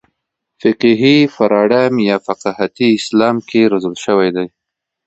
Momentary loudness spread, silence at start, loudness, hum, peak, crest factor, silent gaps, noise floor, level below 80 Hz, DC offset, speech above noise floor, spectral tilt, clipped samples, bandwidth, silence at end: 8 LU; 0.65 s; -13 LUFS; none; 0 dBFS; 14 dB; none; -74 dBFS; -58 dBFS; under 0.1%; 61 dB; -6 dB/octave; under 0.1%; 8.2 kHz; 0.6 s